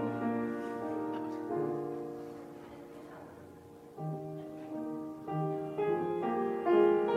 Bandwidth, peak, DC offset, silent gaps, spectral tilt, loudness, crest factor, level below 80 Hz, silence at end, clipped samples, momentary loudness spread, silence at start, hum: 11.5 kHz; -14 dBFS; under 0.1%; none; -8.5 dB/octave; -35 LUFS; 20 dB; -74 dBFS; 0 s; under 0.1%; 19 LU; 0 s; none